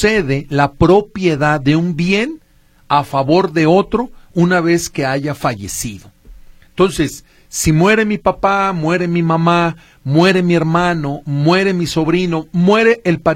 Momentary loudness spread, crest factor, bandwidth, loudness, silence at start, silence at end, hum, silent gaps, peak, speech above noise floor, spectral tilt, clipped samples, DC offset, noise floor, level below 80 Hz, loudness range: 9 LU; 14 dB; 16 kHz; -14 LUFS; 0 s; 0 s; none; none; 0 dBFS; 36 dB; -5.5 dB/octave; under 0.1%; under 0.1%; -50 dBFS; -38 dBFS; 4 LU